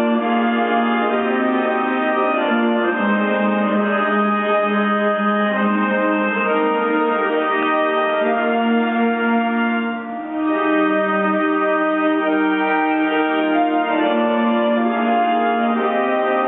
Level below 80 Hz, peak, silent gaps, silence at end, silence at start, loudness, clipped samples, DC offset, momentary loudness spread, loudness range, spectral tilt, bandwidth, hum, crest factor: -68 dBFS; -6 dBFS; none; 0 s; 0 s; -18 LUFS; under 0.1%; under 0.1%; 1 LU; 1 LU; -3.5 dB/octave; 4 kHz; none; 12 dB